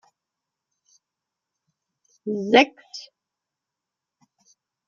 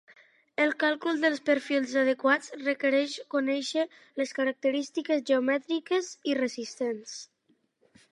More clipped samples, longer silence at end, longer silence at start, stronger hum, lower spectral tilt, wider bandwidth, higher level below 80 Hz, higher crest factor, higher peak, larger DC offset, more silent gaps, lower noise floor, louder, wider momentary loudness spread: neither; first, 1.85 s vs 0.9 s; first, 2.25 s vs 0.1 s; neither; first, -4.5 dB/octave vs -2.5 dB/octave; second, 7.4 kHz vs 11 kHz; first, -78 dBFS vs -86 dBFS; first, 26 dB vs 18 dB; first, -2 dBFS vs -10 dBFS; neither; neither; first, -86 dBFS vs -71 dBFS; first, -20 LUFS vs -28 LUFS; first, 22 LU vs 8 LU